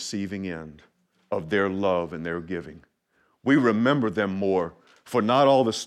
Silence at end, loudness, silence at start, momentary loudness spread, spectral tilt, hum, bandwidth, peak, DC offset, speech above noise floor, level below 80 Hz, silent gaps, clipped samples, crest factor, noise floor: 0 s; -24 LUFS; 0 s; 15 LU; -5.5 dB/octave; none; 13.5 kHz; -6 dBFS; under 0.1%; 44 dB; -62 dBFS; none; under 0.1%; 18 dB; -68 dBFS